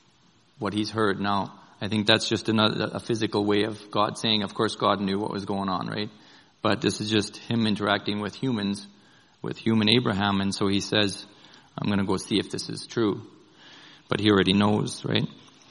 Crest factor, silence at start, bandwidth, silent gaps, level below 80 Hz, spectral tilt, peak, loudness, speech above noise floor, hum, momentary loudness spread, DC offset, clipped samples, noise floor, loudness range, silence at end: 24 dB; 0.6 s; 11 kHz; none; -64 dBFS; -5 dB/octave; -2 dBFS; -25 LUFS; 36 dB; none; 11 LU; under 0.1%; under 0.1%; -61 dBFS; 3 LU; 0.35 s